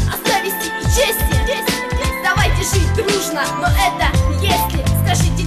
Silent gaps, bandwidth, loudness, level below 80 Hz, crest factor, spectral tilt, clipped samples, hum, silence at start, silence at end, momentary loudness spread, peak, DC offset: none; 14 kHz; -16 LUFS; -22 dBFS; 12 dB; -4 dB/octave; under 0.1%; none; 0 s; 0 s; 4 LU; -4 dBFS; under 0.1%